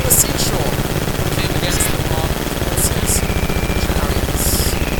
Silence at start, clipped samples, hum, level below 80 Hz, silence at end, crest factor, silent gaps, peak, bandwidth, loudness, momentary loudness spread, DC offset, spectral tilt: 0 s; under 0.1%; none; -22 dBFS; 0 s; 16 dB; none; 0 dBFS; 19.5 kHz; -17 LUFS; 4 LU; 0.8%; -3.5 dB/octave